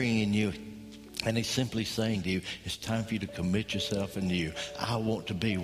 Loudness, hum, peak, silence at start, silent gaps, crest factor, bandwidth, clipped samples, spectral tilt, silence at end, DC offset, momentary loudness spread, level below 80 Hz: -32 LUFS; none; -14 dBFS; 0 s; none; 18 dB; 15.5 kHz; under 0.1%; -5 dB/octave; 0 s; under 0.1%; 7 LU; -54 dBFS